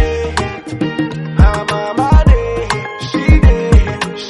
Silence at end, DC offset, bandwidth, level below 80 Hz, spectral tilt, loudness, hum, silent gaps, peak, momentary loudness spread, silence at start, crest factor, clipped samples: 0 s; under 0.1%; 11.5 kHz; -14 dBFS; -6.5 dB/octave; -14 LUFS; none; none; 0 dBFS; 10 LU; 0 s; 12 dB; under 0.1%